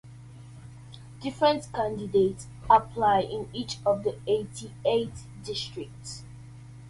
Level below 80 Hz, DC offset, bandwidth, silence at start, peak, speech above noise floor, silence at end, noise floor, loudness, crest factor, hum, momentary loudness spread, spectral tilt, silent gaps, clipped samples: -54 dBFS; under 0.1%; 11.5 kHz; 0.05 s; -6 dBFS; 19 dB; 0 s; -46 dBFS; -27 LUFS; 22 dB; none; 24 LU; -5 dB/octave; none; under 0.1%